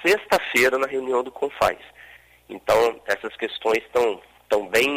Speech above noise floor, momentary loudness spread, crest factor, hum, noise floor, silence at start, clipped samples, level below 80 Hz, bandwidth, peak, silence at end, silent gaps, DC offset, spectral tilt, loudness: 27 dB; 10 LU; 16 dB; none; -49 dBFS; 0 s; under 0.1%; -56 dBFS; 16 kHz; -8 dBFS; 0 s; none; under 0.1%; -3 dB/octave; -22 LUFS